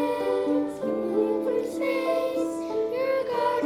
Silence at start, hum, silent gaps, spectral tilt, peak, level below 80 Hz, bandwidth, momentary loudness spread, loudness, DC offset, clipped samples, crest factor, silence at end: 0 s; none; none; -5.5 dB/octave; -12 dBFS; -66 dBFS; 15 kHz; 4 LU; -26 LUFS; under 0.1%; under 0.1%; 14 dB; 0 s